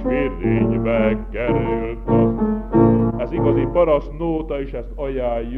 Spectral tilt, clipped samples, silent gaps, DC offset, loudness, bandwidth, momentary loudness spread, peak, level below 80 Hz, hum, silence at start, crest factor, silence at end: -10.5 dB/octave; under 0.1%; none; under 0.1%; -19 LUFS; 3.9 kHz; 8 LU; -4 dBFS; -30 dBFS; none; 0 s; 14 dB; 0 s